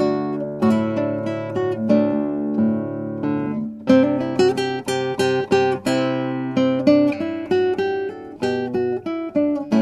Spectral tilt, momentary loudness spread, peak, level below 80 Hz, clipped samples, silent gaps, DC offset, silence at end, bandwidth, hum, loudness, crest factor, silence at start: -6.5 dB/octave; 9 LU; -2 dBFS; -60 dBFS; under 0.1%; none; under 0.1%; 0 s; 12.5 kHz; none; -21 LUFS; 18 dB; 0 s